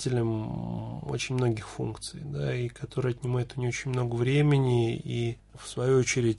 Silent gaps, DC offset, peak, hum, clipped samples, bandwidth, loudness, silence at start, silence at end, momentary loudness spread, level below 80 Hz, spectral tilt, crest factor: none; under 0.1%; -14 dBFS; none; under 0.1%; 11.5 kHz; -29 LUFS; 0 s; 0 s; 11 LU; -52 dBFS; -6 dB/octave; 14 dB